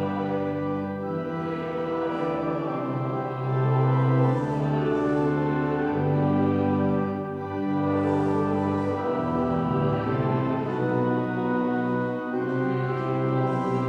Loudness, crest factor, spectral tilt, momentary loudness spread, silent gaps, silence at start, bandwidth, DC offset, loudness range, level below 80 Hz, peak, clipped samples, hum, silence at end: -26 LUFS; 14 dB; -9.5 dB/octave; 6 LU; none; 0 s; 6.4 kHz; under 0.1%; 3 LU; -56 dBFS; -12 dBFS; under 0.1%; none; 0 s